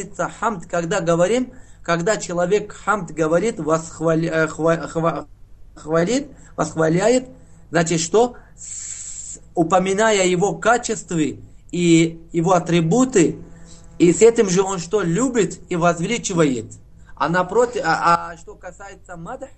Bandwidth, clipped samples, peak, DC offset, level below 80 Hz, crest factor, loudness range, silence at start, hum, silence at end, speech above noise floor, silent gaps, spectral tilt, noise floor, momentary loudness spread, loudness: 9.2 kHz; under 0.1%; 0 dBFS; 0.4%; -48 dBFS; 18 dB; 4 LU; 0 s; none; 0.1 s; 22 dB; none; -5 dB/octave; -41 dBFS; 15 LU; -19 LUFS